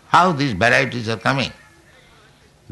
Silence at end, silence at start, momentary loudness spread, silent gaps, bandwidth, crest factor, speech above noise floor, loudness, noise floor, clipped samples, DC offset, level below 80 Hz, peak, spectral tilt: 1.2 s; 0.1 s; 8 LU; none; 12 kHz; 18 dB; 34 dB; -18 LUFS; -51 dBFS; under 0.1%; under 0.1%; -52 dBFS; -4 dBFS; -5 dB/octave